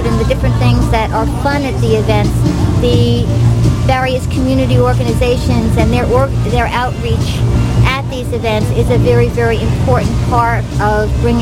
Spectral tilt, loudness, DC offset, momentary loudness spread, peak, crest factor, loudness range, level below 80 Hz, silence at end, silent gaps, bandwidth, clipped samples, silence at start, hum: -7 dB/octave; -13 LUFS; 0.2%; 4 LU; 0 dBFS; 12 dB; 1 LU; -20 dBFS; 0 s; none; 15 kHz; under 0.1%; 0 s; none